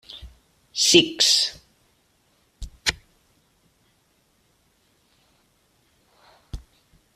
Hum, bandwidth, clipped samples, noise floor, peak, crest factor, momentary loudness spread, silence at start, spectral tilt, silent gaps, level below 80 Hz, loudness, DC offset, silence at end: none; 15.5 kHz; under 0.1%; -65 dBFS; -2 dBFS; 26 dB; 28 LU; 0.1 s; -1.5 dB/octave; none; -48 dBFS; -19 LUFS; under 0.1%; 0.6 s